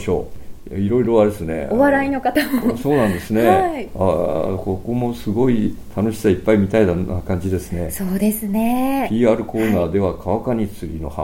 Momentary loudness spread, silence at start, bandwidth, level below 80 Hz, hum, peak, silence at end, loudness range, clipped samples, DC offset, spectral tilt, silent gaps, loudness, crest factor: 9 LU; 0 s; 17 kHz; -38 dBFS; none; -2 dBFS; 0 s; 2 LU; under 0.1%; under 0.1%; -7 dB/octave; none; -19 LUFS; 16 dB